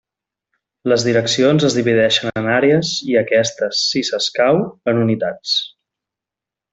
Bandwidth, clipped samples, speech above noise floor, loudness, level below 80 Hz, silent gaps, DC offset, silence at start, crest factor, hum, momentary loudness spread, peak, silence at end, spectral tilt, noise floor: 8.4 kHz; under 0.1%; 71 dB; -16 LUFS; -58 dBFS; none; under 0.1%; 0.85 s; 16 dB; none; 5 LU; -2 dBFS; 1.05 s; -4.5 dB/octave; -87 dBFS